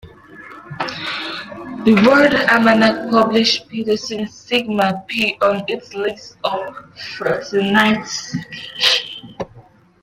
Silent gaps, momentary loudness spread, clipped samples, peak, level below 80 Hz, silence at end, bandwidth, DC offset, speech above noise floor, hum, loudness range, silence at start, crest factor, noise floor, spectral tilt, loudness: none; 18 LU; under 0.1%; 0 dBFS; -54 dBFS; 0.4 s; 15.5 kHz; under 0.1%; 29 dB; none; 6 LU; 0.05 s; 18 dB; -46 dBFS; -4 dB/octave; -17 LUFS